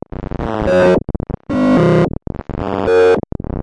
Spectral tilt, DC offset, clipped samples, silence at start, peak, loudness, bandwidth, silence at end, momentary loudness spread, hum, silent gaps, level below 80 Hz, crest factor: -8 dB/octave; under 0.1%; under 0.1%; 0.2 s; -2 dBFS; -15 LUFS; 10.5 kHz; 0 s; 14 LU; none; none; -30 dBFS; 12 dB